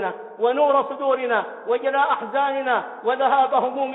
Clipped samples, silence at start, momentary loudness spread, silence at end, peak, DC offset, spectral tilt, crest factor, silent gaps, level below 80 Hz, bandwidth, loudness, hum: under 0.1%; 0 s; 6 LU; 0 s; -6 dBFS; under 0.1%; -7.5 dB/octave; 14 dB; none; -74 dBFS; 4.1 kHz; -21 LUFS; none